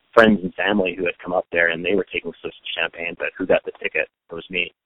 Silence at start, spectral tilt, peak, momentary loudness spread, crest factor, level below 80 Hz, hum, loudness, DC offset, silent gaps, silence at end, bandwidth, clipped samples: 0.15 s; -6.5 dB/octave; 0 dBFS; 11 LU; 22 dB; -54 dBFS; none; -21 LUFS; under 0.1%; none; 0.15 s; 9.4 kHz; under 0.1%